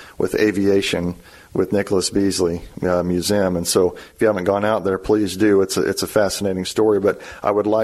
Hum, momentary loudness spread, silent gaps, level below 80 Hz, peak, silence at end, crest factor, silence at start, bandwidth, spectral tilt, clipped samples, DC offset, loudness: none; 6 LU; none; -46 dBFS; -4 dBFS; 0 s; 14 dB; 0 s; 15 kHz; -4.5 dB/octave; under 0.1%; under 0.1%; -19 LUFS